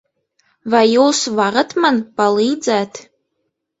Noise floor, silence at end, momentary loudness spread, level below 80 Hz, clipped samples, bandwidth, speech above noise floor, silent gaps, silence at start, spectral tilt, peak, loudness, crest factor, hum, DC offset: -72 dBFS; 0.8 s; 11 LU; -62 dBFS; under 0.1%; 8.2 kHz; 57 dB; none; 0.65 s; -3.5 dB/octave; 0 dBFS; -15 LUFS; 16 dB; none; under 0.1%